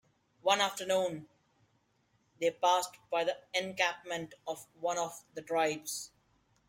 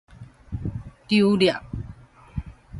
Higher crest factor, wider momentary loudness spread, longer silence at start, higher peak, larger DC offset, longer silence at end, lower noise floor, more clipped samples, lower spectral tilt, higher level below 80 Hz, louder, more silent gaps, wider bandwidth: about the same, 22 dB vs 20 dB; second, 13 LU vs 18 LU; first, 0.45 s vs 0.2 s; second, -14 dBFS vs -6 dBFS; neither; first, 0.6 s vs 0 s; first, -74 dBFS vs -45 dBFS; neither; second, -2 dB/octave vs -6.5 dB/octave; second, -80 dBFS vs -42 dBFS; second, -33 LUFS vs -22 LUFS; neither; first, 16.5 kHz vs 11.5 kHz